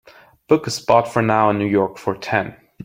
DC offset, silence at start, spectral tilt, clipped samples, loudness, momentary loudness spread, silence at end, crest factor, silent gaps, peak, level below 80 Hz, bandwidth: under 0.1%; 0.5 s; -5.5 dB/octave; under 0.1%; -18 LUFS; 6 LU; 0 s; 18 dB; none; -2 dBFS; -56 dBFS; 16.5 kHz